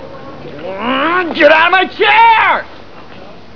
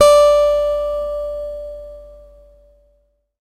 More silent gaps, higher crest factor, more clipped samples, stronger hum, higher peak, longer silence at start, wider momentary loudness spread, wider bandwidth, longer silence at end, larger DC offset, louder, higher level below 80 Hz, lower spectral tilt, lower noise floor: neither; about the same, 12 dB vs 16 dB; first, 0.5% vs under 0.1%; neither; about the same, 0 dBFS vs 0 dBFS; about the same, 0 s vs 0 s; about the same, 23 LU vs 22 LU; second, 5.4 kHz vs 15.5 kHz; second, 0.25 s vs 1.35 s; first, 2% vs under 0.1%; first, -9 LUFS vs -16 LUFS; second, -50 dBFS vs -40 dBFS; first, -5 dB/octave vs -2 dB/octave; second, -35 dBFS vs -61 dBFS